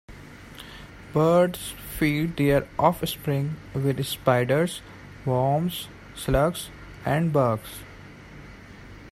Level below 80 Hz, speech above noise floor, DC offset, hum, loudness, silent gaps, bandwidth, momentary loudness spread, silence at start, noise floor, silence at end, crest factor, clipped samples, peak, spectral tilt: -44 dBFS; 21 dB; under 0.1%; none; -25 LUFS; none; 16 kHz; 23 LU; 0.1 s; -44 dBFS; 0 s; 20 dB; under 0.1%; -4 dBFS; -6 dB/octave